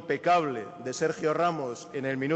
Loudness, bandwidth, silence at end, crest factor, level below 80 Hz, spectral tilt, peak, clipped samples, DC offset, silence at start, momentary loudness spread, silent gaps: -29 LUFS; 8.4 kHz; 0 s; 14 dB; -70 dBFS; -5 dB/octave; -14 dBFS; under 0.1%; under 0.1%; 0 s; 10 LU; none